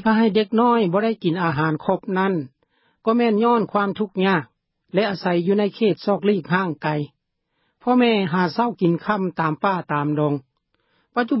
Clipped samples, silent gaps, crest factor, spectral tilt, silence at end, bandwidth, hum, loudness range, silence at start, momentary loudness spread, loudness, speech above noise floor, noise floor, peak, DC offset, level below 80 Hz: under 0.1%; none; 16 dB; -11 dB/octave; 0 s; 5.8 kHz; none; 2 LU; 0 s; 8 LU; -21 LUFS; 53 dB; -73 dBFS; -6 dBFS; under 0.1%; -64 dBFS